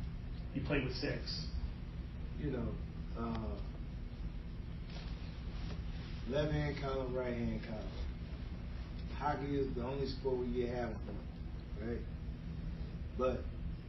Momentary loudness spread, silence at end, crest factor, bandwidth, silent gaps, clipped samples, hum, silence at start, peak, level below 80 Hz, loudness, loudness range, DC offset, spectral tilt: 9 LU; 0 s; 18 dB; 6 kHz; none; under 0.1%; none; 0 s; -22 dBFS; -44 dBFS; -41 LUFS; 4 LU; under 0.1%; -6 dB/octave